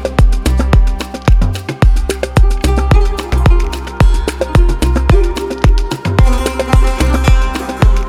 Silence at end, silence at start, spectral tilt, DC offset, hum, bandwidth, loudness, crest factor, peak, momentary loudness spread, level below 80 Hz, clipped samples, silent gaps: 0 s; 0 s; -6 dB/octave; under 0.1%; none; 13.5 kHz; -13 LUFS; 10 dB; 0 dBFS; 4 LU; -12 dBFS; under 0.1%; none